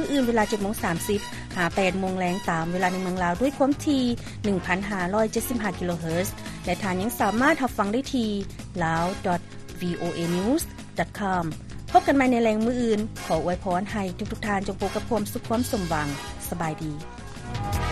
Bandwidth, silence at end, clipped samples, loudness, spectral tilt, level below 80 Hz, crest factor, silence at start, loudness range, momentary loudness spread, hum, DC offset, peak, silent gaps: 13.5 kHz; 0 s; under 0.1%; -26 LUFS; -5.5 dB/octave; -44 dBFS; 20 dB; 0 s; 4 LU; 10 LU; none; under 0.1%; -6 dBFS; none